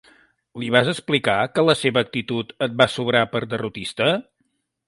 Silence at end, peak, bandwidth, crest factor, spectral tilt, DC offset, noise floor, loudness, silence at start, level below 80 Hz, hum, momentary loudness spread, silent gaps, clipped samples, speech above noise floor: 0.65 s; 0 dBFS; 11.5 kHz; 22 dB; -5 dB/octave; under 0.1%; -71 dBFS; -21 LUFS; 0.55 s; -58 dBFS; none; 9 LU; none; under 0.1%; 50 dB